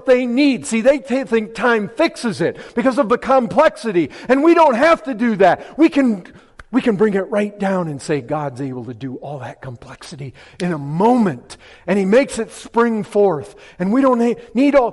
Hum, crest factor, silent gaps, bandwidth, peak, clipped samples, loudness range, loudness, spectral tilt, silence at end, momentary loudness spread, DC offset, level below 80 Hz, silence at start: none; 14 dB; none; 11.5 kHz; -4 dBFS; under 0.1%; 7 LU; -17 LUFS; -6 dB/octave; 0 s; 15 LU; under 0.1%; -52 dBFS; 0.05 s